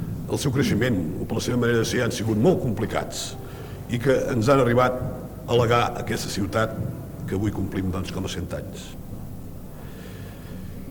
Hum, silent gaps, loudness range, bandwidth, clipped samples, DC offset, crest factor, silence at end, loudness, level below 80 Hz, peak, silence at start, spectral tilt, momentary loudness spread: none; none; 8 LU; 19 kHz; under 0.1%; under 0.1%; 18 dB; 0 s; -24 LUFS; -42 dBFS; -8 dBFS; 0 s; -6 dB/octave; 18 LU